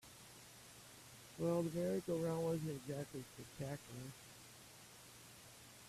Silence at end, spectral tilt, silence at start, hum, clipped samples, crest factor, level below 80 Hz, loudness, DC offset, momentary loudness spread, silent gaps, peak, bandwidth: 0 s; -6 dB/octave; 0.05 s; none; under 0.1%; 18 dB; -74 dBFS; -43 LUFS; under 0.1%; 18 LU; none; -28 dBFS; 15.5 kHz